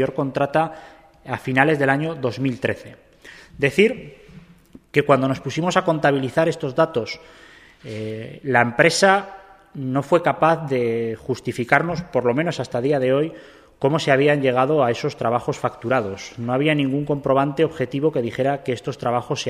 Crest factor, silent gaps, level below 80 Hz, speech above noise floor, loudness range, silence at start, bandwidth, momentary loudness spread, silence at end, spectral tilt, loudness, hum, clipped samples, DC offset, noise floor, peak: 20 dB; none; -56 dBFS; 28 dB; 3 LU; 0 s; 14.5 kHz; 12 LU; 0 s; -5.5 dB/octave; -20 LUFS; none; under 0.1%; under 0.1%; -48 dBFS; 0 dBFS